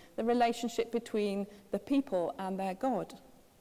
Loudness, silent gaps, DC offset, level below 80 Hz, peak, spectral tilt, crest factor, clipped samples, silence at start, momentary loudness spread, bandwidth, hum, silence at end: -34 LUFS; none; under 0.1%; -68 dBFS; -18 dBFS; -5.5 dB/octave; 16 dB; under 0.1%; 0 s; 9 LU; 16 kHz; none; 0.4 s